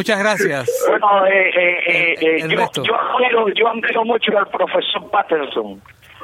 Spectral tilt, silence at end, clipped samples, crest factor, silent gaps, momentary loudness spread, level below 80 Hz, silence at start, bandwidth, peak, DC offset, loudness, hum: -3.5 dB/octave; 0 s; under 0.1%; 14 dB; none; 6 LU; -64 dBFS; 0 s; 16 kHz; -2 dBFS; under 0.1%; -16 LUFS; none